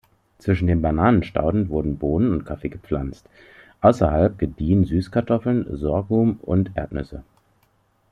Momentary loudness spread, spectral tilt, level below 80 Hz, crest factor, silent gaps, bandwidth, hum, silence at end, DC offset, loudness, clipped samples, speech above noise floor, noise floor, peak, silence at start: 12 LU; -9.5 dB/octave; -38 dBFS; 20 dB; none; 9.6 kHz; none; 0.9 s; under 0.1%; -21 LUFS; under 0.1%; 43 dB; -63 dBFS; -2 dBFS; 0.45 s